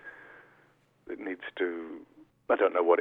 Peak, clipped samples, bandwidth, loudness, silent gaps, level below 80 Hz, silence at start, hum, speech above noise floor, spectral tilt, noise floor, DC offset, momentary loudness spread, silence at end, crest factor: -10 dBFS; under 0.1%; 3.9 kHz; -30 LUFS; none; -76 dBFS; 0.05 s; none; 37 dB; -6.5 dB/octave; -65 dBFS; under 0.1%; 26 LU; 0 s; 20 dB